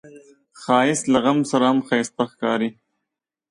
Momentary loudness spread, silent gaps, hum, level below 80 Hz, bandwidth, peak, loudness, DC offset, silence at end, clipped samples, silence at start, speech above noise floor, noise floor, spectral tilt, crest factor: 7 LU; none; none; -64 dBFS; 11.5 kHz; -4 dBFS; -20 LUFS; under 0.1%; 0.8 s; under 0.1%; 0.05 s; 63 dB; -83 dBFS; -4.5 dB/octave; 18 dB